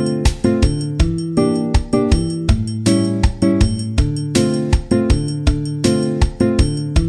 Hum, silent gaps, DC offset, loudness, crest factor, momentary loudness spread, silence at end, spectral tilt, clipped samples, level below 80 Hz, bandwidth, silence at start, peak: none; none; under 0.1%; -17 LUFS; 14 dB; 3 LU; 0 s; -6.5 dB/octave; under 0.1%; -20 dBFS; 12.5 kHz; 0 s; -2 dBFS